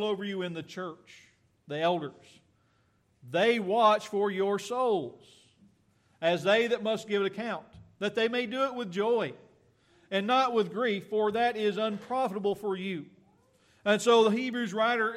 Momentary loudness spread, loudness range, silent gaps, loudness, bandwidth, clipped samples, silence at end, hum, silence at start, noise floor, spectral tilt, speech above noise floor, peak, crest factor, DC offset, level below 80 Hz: 13 LU; 3 LU; none; -29 LUFS; 14 kHz; under 0.1%; 0 s; none; 0 s; -69 dBFS; -4.5 dB/octave; 41 dB; -10 dBFS; 20 dB; under 0.1%; -76 dBFS